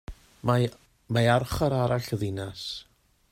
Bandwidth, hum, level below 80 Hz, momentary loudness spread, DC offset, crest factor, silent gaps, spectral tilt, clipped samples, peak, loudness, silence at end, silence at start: 16 kHz; none; -48 dBFS; 13 LU; under 0.1%; 20 dB; none; -6 dB/octave; under 0.1%; -8 dBFS; -27 LUFS; 0.5 s; 0.1 s